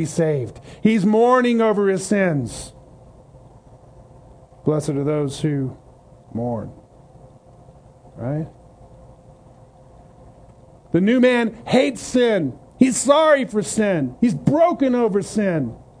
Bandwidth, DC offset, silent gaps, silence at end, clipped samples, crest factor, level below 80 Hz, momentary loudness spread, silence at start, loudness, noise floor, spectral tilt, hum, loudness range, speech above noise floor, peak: 10.5 kHz; under 0.1%; none; 0.25 s; under 0.1%; 20 dB; -52 dBFS; 14 LU; 0 s; -19 LUFS; -47 dBFS; -5.5 dB/octave; none; 17 LU; 29 dB; 0 dBFS